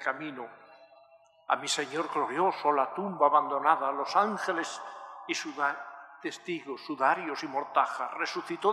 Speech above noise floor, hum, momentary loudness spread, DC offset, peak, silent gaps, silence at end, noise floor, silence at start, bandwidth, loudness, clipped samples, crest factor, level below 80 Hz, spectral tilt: 30 dB; 50 Hz at -65 dBFS; 14 LU; under 0.1%; -8 dBFS; none; 0 s; -60 dBFS; 0 s; 13.5 kHz; -30 LUFS; under 0.1%; 22 dB; under -90 dBFS; -3 dB/octave